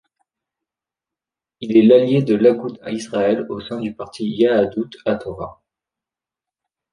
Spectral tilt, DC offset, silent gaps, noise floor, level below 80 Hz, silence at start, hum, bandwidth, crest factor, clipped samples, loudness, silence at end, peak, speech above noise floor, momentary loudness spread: -7 dB/octave; under 0.1%; none; -88 dBFS; -56 dBFS; 1.6 s; none; 10.5 kHz; 18 dB; under 0.1%; -18 LUFS; 1.4 s; -2 dBFS; 71 dB; 16 LU